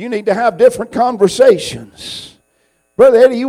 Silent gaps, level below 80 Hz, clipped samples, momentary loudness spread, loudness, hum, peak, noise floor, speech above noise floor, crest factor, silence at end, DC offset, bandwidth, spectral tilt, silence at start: none; -52 dBFS; under 0.1%; 19 LU; -11 LUFS; none; 0 dBFS; -60 dBFS; 49 dB; 12 dB; 0 s; under 0.1%; 13.5 kHz; -4.5 dB/octave; 0 s